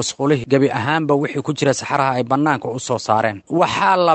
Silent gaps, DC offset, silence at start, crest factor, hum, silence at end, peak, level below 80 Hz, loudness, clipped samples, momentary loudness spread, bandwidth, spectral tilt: none; under 0.1%; 0 s; 16 dB; none; 0 s; -2 dBFS; -56 dBFS; -18 LUFS; under 0.1%; 5 LU; 9.2 kHz; -5 dB/octave